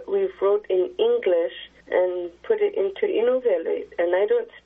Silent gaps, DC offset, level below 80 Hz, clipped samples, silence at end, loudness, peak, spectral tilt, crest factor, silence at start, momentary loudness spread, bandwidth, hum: none; under 0.1%; -64 dBFS; under 0.1%; 0.05 s; -23 LUFS; -8 dBFS; -2.5 dB/octave; 16 dB; 0 s; 5 LU; 3.9 kHz; none